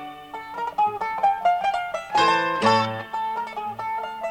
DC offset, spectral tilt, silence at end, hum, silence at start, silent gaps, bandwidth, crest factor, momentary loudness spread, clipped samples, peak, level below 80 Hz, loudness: under 0.1%; -4 dB/octave; 0 s; none; 0 s; none; 16.5 kHz; 18 dB; 11 LU; under 0.1%; -6 dBFS; -60 dBFS; -23 LUFS